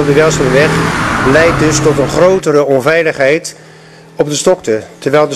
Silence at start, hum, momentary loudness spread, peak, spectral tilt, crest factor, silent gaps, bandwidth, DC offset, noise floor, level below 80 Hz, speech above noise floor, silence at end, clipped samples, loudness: 0 s; none; 7 LU; 0 dBFS; -5 dB/octave; 10 dB; none; 13.5 kHz; under 0.1%; -36 dBFS; -34 dBFS; 27 dB; 0 s; under 0.1%; -10 LUFS